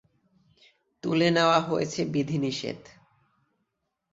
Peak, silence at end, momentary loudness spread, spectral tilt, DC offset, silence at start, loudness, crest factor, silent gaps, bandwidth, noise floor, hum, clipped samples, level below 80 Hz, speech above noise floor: -8 dBFS; 1.35 s; 15 LU; -5.5 dB/octave; under 0.1%; 1.05 s; -26 LUFS; 22 dB; none; 8 kHz; -80 dBFS; none; under 0.1%; -66 dBFS; 54 dB